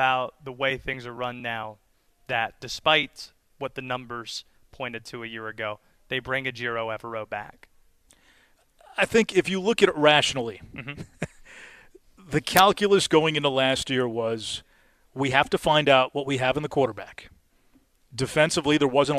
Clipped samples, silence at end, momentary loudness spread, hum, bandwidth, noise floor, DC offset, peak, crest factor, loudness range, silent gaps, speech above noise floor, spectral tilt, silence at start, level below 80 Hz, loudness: under 0.1%; 0 s; 18 LU; none; 14.5 kHz; -61 dBFS; under 0.1%; -2 dBFS; 24 dB; 9 LU; none; 37 dB; -4 dB/octave; 0 s; -56 dBFS; -24 LUFS